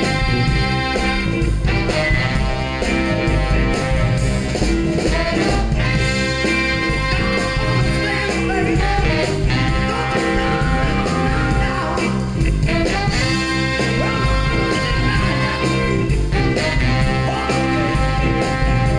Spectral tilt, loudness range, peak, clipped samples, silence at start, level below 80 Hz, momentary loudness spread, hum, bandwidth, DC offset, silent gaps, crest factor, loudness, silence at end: -5.5 dB/octave; 1 LU; -4 dBFS; under 0.1%; 0 s; -24 dBFS; 2 LU; none; 10 kHz; under 0.1%; none; 12 dB; -18 LUFS; 0 s